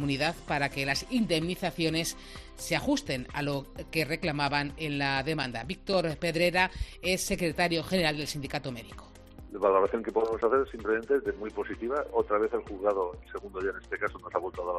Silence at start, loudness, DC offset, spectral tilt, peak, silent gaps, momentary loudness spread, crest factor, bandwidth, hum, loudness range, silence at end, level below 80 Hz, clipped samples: 0 s; -30 LUFS; under 0.1%; -4.5 dB/octave; -10 dBFS; none; 9 LU; 22 dB; 14 kHz; none; 2 LU; 0 s; -48 dBFS; under 0.1%